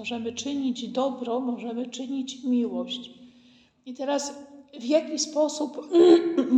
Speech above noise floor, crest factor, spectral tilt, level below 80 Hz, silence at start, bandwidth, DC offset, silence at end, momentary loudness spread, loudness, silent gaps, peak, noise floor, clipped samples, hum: 33 dB; 20 dB; -3.5 dB/octave; -76 dBFS; 0 s; 9 kHz; under 0.1%; 0 s; 16 LU; -26 LUFS; none; -6 dBFS; -57 dBFS; under 0.1%; none